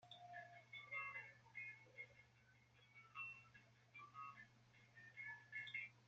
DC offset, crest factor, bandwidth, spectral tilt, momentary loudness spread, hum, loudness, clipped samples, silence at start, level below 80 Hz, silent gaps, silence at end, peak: under 0.1%; 20 dB; 7.6 kHz; -0.5 dB/octave; 17 LU; none; -55 LUFS; under 0.1%; 0 s; -90 dBFS; none; 0 s; -38 dBFS